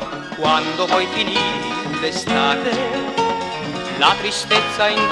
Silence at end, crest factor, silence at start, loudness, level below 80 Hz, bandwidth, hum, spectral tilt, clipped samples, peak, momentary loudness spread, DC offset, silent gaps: 0 s; 18 dB; 0 s; -18 LUFS; -50 dBFS; 12.5 kHz; none; -3 dB/octave; under 0.1%; -2 dBFS; 8 LU; under 0.1%; none